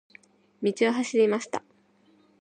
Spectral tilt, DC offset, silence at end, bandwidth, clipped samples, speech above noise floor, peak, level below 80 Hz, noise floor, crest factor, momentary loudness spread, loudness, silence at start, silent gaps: -4.5 dB/octave; under 0.1%; 0.8 s; 9.4 kHz; under 0.1%; 38 dB; -10 dBFS; -80 dBFS; -62 dBFS; 18 dB; 11 LU; -26 LUFS; 0.6 s; none